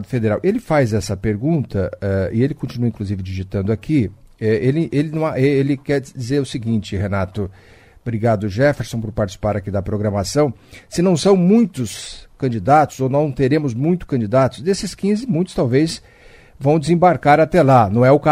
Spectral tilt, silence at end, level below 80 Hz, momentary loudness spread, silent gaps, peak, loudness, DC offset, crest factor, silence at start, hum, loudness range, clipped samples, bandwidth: -7 dB/octave; 0 s; -42 dBFS; 11 LU; none; 0 dBFS; -18 LUFS; under 0.1%; 16 dB; 0 s; none; 4 LU; under 0.1%; 15 kHz